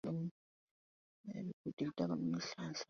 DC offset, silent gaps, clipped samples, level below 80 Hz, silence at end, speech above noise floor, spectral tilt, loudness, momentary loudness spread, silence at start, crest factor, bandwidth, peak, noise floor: under 0.1%; 0.31-1.24 s, 1.53-1.64 s, 1.73-1.77 s; under 0.1%; -78 dBFS; 0.05 s; over 49 dB; -6 dB/octave; -43 LUFS; 9 LU; 0.05 s; 18 dB; 7.2 kHz; -24 dBFS; under -90 dBFS